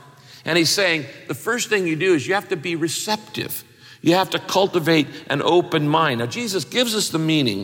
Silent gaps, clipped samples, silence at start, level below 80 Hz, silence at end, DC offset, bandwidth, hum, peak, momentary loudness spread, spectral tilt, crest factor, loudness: none; under 0.1%; 0.3 s; -66 dBFS; 0 s; under 0.1%; 17 kHz; none; -6 dBFS; 8 LU; -4 dB/octave; 16 dB; -20 LUFS